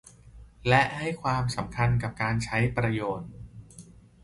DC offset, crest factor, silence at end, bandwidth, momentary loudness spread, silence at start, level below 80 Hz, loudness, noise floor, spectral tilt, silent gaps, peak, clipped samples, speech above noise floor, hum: under 0.1%; 22 dB; 0.4 s; 11.5 kHz; 19 LU; 0.25 s; -48 dBFS; -27 LUFS; -50 dBFS; -6 dB/octave; none; -6 dBFS; under 0.1%; 24 dB; none